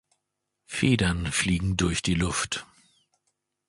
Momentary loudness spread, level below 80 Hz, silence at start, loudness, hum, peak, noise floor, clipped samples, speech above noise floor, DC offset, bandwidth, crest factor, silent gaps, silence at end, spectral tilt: 8 LU; -42 dBFS; 0.7 s; -26 LUFS; none; -8 dBFS; -82 dBFS; under 0.1%; 56 dB; under 0.1%; 11.5 kHz; 20 dB; none; 1.05 s; -4 dB/octave